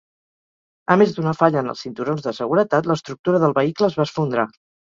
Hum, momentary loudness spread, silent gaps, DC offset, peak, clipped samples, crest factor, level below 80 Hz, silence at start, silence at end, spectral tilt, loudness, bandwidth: none; 9 LU; 3.19-3.24 s; under 0.1%; -2 dBFS; under 0.1%; 18 dB; -62 dBFS; 0.9 s; 0.4 s; -7 dB/octave; -20 LUFS; 7.6 kHz